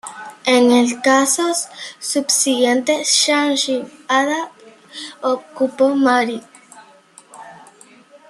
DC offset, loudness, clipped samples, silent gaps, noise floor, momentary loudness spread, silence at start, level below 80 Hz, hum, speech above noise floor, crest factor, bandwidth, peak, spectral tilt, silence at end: under 0.1%; -16 LUFS; under 0.1%; none; -47 dBFS; 15 LU; 0.05 s; -70 dBFS; none; 30 dB; 16 dB; 13 kHz; -2 dBFS; -1 dB/octave; 0.75 s